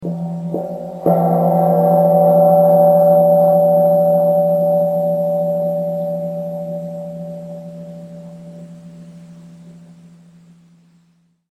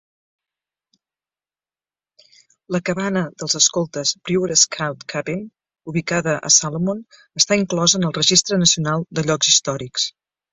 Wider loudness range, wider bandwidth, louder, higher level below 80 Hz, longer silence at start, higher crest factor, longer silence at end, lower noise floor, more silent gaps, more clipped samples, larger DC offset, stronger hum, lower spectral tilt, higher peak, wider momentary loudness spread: first, 19 LU vs 6 LU; first, 13.5 kHz vs 8.2 kHz; first, -14 LUFS vs -18 LUFS; about the same, -62 dBFS vs -58 dBFS; second, 0 s vs 2.7 s; second, 14 dB vs 20 dB; first, 1.75 s vs 0.4 s; second, -58 dBFS vs under -90 dBFS; neither; neither; neither; neither; first, -10 dB/octave vs -2.5 dB/octave; about the same, -2 dBFS vs 0 dBFS; first, 22 LU vs 11 LU